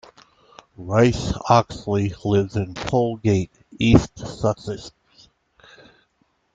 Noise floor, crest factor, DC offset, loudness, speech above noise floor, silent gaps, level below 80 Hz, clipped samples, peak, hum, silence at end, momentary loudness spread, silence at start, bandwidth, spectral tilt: -67 dBFS; 20 dB; under 0.1%; -21 LUFS; 46 dB; none; -40 dBFS; under 0.1%; -2 dBFS; none; 1.65 s; 15 LU; 0.8 s; 7.8 kHz; -6.5 dB/octave